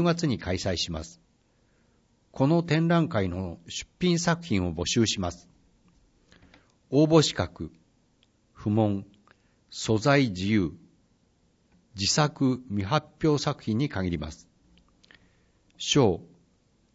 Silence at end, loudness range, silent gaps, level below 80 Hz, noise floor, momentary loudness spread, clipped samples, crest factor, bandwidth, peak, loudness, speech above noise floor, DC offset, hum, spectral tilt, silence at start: 0.7 s; 2 LU; none; -52 dBFS; -66 dBFS; 13 LU; under 0.1%; 20 dB; 8 kHz; -8 dBFS; -26 LUFS; 41 dB; under 0.1%; none; -5 dB/octave; 0 s